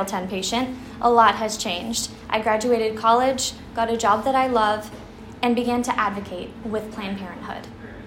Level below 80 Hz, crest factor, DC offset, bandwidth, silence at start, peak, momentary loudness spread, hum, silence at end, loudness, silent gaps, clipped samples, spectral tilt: -50 dBFS; 20 dB; under 0.1%; 16 kHz; 0 s; -2 dBFS; 15 LU; none; 0 s; -22 LUFS; none; under 0.1%; -3.5 dB/octave